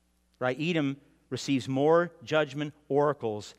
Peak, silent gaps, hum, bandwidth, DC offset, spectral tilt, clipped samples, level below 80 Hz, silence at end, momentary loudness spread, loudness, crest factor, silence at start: -10 dBFS; none; none; 12 kHz; under 0.1%; -6 dB/octave; under 0.1%; -72 dBFS; 0.1 s; 12 LU; -29 LUFS; 18 dB; 0.4 s